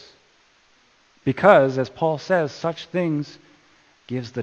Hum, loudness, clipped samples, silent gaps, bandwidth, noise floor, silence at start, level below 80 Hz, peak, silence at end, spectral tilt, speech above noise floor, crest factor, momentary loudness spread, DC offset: none; -21 LUFS; under 0.1%; none; 8.2 kHz; -59 dBFS; 1.25 s; -64 dBFS; 0 dBFS; 0 s; -7 dB/octave; 38 dB; 22 dB; 15 LU; under 0.1%